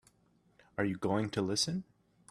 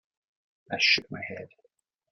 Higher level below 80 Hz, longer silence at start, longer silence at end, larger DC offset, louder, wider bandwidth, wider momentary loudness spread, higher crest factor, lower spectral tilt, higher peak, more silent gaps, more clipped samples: about the same, -70 dBFS vs -74 dBFS; about the same, 0.8 s vs 0.7 s; second, 0.45 s vs 0.65 s; neither; second, -34 LUFS vs -24 LUFS; about the same, 13 kHz vs 12 kHz; second, 8 LU vs 17 LU; about the same, 20 dB vs 22 dB; first, -4.5 dB/octave vs -2 dB/octave; second, -18 dBFS vs -10 dBFS; neither; neither